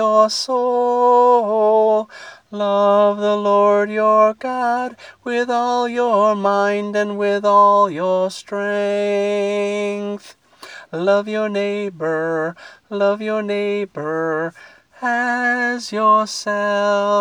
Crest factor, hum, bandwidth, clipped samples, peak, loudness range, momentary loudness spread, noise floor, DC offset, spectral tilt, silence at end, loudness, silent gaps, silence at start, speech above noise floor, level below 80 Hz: 14 dB; none; 11 kHz; under 0.1%; -2 dBFS; 6 LU; 10 LU; -40 dBFS; under 0.1%; -4.5 dB/octave; 0 s; -17 LUFS; none; 0 s; 22 dB; -70 dBFS